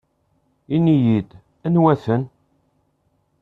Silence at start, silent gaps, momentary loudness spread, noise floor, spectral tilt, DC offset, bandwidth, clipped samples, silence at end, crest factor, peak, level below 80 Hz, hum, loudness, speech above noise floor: 0.7 s; none; 15 LU; -66 dBFS; -10.5 dB/octave; under 0.1%; 4.8 kHz; under 0.1%; 1.15 s; 18 dB; -2 dBFS; -56 dBFS; none; -19 LUFS; 49 dB